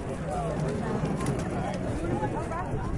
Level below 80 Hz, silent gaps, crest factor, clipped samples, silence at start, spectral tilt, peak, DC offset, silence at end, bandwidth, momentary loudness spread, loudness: -40 dBFS; none; 14 dB; under 0.1%; 0 s; -7 dB/octave; -16 dBFS; under 0.1%; 0 s; 11.5 kHz; 3 LU; -31 LUFS